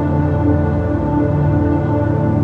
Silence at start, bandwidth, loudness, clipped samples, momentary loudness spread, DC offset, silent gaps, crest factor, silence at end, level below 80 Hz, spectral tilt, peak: 0 s; 4.6 kHz; -16 LUFS; under 0.1%; 2 LU; under 0.1%; none; 12 dB; 0 s; -32 dBFS; -11 dB/octave; -2 dBFS